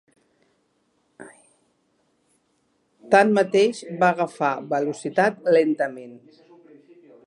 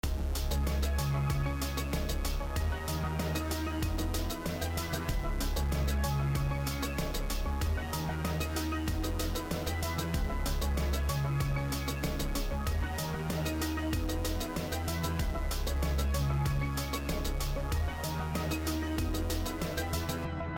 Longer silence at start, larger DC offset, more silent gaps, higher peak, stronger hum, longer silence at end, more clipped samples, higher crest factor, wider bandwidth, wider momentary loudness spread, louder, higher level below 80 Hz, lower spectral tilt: first, 1.2 s vs 0.05 s; neither; neither; first, -2 dBFS vs -20 dBFS; neither; first, 1.1 s vs 0 s; neither; first, 22 dB vs 12 dB; second, 11.5 kHz vs 17.5 kHz; first, 9 LU vs 3 LU; first, -21 LUFS vs -34 LUFS; second, -76 dBFS vs -36 dBFS; about the same, -5.5 dB/octave vs -5 dB/octave